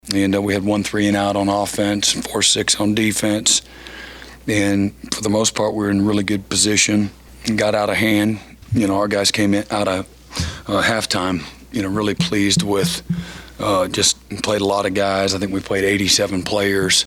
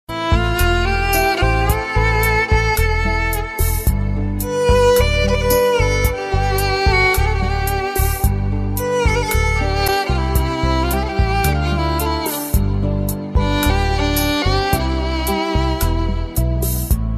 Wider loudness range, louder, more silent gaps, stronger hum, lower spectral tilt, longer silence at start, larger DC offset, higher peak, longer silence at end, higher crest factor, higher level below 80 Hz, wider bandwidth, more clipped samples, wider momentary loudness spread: about the same, 3 LU vs 3 LU; about the same, -18 LUFS vs -17 LUFS; neither; neither; second, -3.5 dB/octave vs -5 dB/octave; about the same, 0.05 s vs 0.1 s; neither; about the same, -2 dBFS vs -2 dBFS; about the same, 0 s vs 0 s; about the same, 16 dB vs 14 dB; second, -44 dBFS vs -20 dBFS; first, 16.5 kHz vs 14.5 kHz; neither; first, 11 LU vs 5 LU